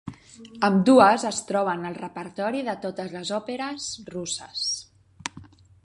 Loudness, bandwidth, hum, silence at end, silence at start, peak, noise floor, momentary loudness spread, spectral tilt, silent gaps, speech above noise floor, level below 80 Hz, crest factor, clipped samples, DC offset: -24 LUFS; 11.5 kHz; none; 0.4 s; 0.05 s; -2 dBFS; -48 dBFS; 19 LU; -4.5 dB/octave; none; 24 dB; -62 dBFS; 22 dB; under 0.1%; under 0.1%